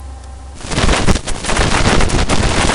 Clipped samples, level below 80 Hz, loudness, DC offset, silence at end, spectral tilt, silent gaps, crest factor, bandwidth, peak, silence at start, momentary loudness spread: under 0.1%; -18 dBFS; -15 LUFS; under 0.1%; 0 s; -4 dB/octave; none; 14 dB; 11 kHz; 0 dBFS; 0 s; 19 LU